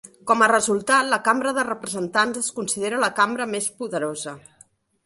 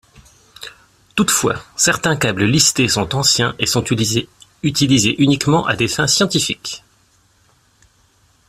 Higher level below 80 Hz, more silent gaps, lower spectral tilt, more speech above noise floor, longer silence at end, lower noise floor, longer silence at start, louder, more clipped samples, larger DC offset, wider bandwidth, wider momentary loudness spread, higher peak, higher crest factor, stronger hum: second, -66 dBFS vs -48 dBFS; neither; about the same, -2.5 dB/octave vs -3.5 dB/octave; second, 34 dB vs 40 dB; second, 0.65 s vs 1.7 s; about the same, -56 dBFS vs -56 dBFS; second, 0.05 s vs 0.6 s; second, -21 LUFS vs -15 LUFS; neither; neither; second, 12 kHz vs 16 kHz; second, 10 LU vs 15 LU; second, -4 dBFS vs 0 dBFS; about the same, 20 dB vs 18 dB; neither